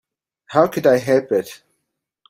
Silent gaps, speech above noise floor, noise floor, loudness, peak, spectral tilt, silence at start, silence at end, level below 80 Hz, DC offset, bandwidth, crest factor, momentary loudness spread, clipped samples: none; 60 dB; -76 dBFS; -18 LUFS; -2 dBFS; -6 dB/octave; 0.5 s; 0.75 s; -60 dBFS; under 0.1%; 16 kHz; 18 dB; 7 LU; under 0.1%